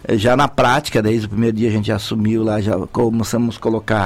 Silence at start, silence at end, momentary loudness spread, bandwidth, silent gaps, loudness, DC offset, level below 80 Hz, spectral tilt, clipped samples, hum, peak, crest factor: 0 s; 0 s; 5 LU; 15.5 kHz; none; -17 LUFS; under 0.1%; -40 dBFS; -6 dB/octave; under 0.1%; none; -4 dBFS; 12 dB